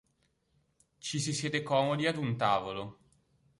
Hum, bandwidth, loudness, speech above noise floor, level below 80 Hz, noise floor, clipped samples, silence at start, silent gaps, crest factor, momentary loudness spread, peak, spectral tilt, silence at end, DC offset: none; 11.5 kHz; -32 LUFS; 43 dB; -68 dBFS; -75 dBFS; under 0.1%; 1.05 s; none; 20 dB; 12 LU; -14 dBFS; -4.5 dB/octave; 0.65 s; under 0.1%